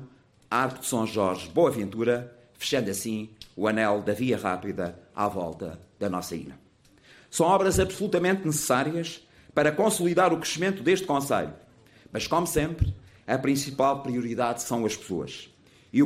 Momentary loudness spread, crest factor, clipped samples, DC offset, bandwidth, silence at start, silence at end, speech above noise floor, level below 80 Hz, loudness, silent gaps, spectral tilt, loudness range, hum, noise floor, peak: 12 LU; 16 dB; under 0.1%; under 0.1%; 16 kHz; 0 s; 0 s; 31 dB; -46 dBFS; -27 LUFS; none; -4.5 dB/octave; 4 LU; none; -57 dBFS; -10 dBFS